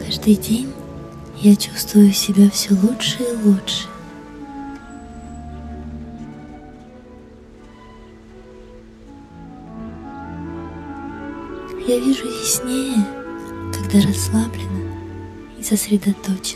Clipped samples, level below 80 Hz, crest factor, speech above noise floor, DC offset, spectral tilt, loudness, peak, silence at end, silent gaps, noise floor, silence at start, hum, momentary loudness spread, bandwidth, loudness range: under 0.1%; -44 dBFS; 18 dB; 25 dB; under 0.1%; -5 dB/octave; -18 LUFS; -2 dBFS; 0 s; none; -42 dBFS; 0 s; none; 22 LU; 15 kHz; 22 LU